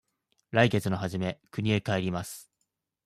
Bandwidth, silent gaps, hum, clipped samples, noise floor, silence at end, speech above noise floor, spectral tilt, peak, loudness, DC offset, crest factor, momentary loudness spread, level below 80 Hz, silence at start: 14.5 kHz; none; none; under 0.1%; -81 dBFS; 0.6 s; 53 dB; -6 dB/octave; -10 dBFS; -29 LUFS; under 0.1%; 20 dB; 11 LU; -62 dBFS; 0.5 s